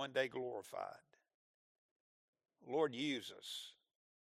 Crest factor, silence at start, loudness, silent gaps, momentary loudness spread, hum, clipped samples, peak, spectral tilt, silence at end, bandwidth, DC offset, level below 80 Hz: 22 dB; 0 s; -43 LUFS; 1.34-2.33 s; 12 LU; none; under 0.1%; -24 dBFS; -4 dB/octave; 0.45 s; 14.5 kHz; under 0.1%; under -90 dBFS